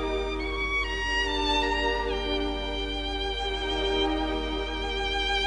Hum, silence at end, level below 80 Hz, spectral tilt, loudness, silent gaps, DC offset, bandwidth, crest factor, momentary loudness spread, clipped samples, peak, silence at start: none; 0 s; -36 dBFS; -4 dB/octave; -28 LUFS; none; under 0.1%; 10.5 kHz; 14 dB; 5 LU; under 0.1%; -14 dBFS; 0 s